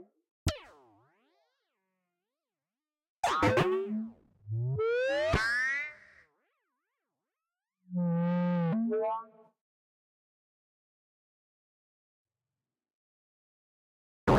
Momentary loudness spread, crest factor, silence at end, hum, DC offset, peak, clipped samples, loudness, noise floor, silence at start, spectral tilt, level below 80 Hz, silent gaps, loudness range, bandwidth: 12 LU; 22 dB; 0 s; none; under 0.1%; -12 dBFS; under 0.1%; -31 LUFS; under -90 dBFS; 0 s; -6.5 dB/octave; -54 dBFS; 0.31-0.46 s, 3.09-3.16 s, 9.61-12.25 s, 12.94-14.27 s; 9 LU; 15.5 kHz